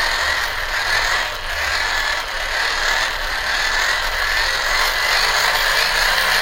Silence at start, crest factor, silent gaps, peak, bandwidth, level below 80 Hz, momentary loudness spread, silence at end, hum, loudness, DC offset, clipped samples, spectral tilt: 0 s; 18 dB; none; 0 dBFS; 16 kHz; -32 dBFS; 5 LU; 0 s; none; -17 LUFS; under 0.1%; under 0.1%; 0 dB/octave